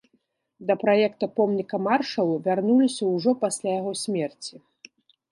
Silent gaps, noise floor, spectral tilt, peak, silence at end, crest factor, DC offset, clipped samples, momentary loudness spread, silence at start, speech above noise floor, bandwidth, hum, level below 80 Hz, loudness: none; -70 dBFS; -5 dB/octave; -8 dBFS; 0.8 s; 16 dB; under 0.1%; under 0.1%; 8 LU; 0.6 s; 46 dB; 11.5 kHz; none; -76 dBFS; -24 LUFS